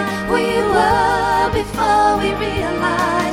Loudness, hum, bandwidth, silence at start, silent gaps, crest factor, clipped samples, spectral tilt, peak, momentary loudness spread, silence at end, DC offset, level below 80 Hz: -16 LUFS; none; 19 kHz; 0 s; none; 16 dB; under 0.1%; -5 dB/octave; -2 dBFS; 5 LU; 0 s; under 0.1%; -34 dBFS